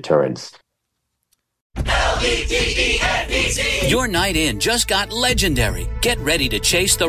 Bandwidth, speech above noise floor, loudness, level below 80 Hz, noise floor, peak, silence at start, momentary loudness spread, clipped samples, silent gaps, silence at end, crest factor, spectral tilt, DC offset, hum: 16 kHz; 57 dB; -18 LUFS; -28 dBFS; -75 dBFS; -4 dBFS; 0 s; 5 LU; under 0.1%; 1.61-1.70 s; 0 s; 16 dB; -3 dB/octave; under 0.1%; none